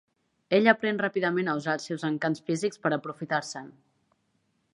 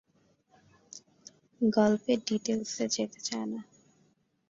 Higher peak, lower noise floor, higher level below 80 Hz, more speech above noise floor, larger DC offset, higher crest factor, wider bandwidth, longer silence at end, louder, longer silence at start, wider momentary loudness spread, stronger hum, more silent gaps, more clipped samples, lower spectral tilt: first, -4 dBFS vs -12 dBFS; about the same, -73 dBFS vs -70 dBFS; second, -78 dBFS vs -72 dBFS; first, 46 dB vs 40 dB; neither; about the same, 24 dB vs 20 dB; first, 11.5 kHz vs 7.8 kHz; first, 1 s vs 0.85 s; first, -27 LUFS vs -30 LUFS; second, 0.5 s vs 0.95 s; second, 9 LU vs 23 LU; neither; neither; neither; first, -5.5 dB/octave vs -4 dB/octave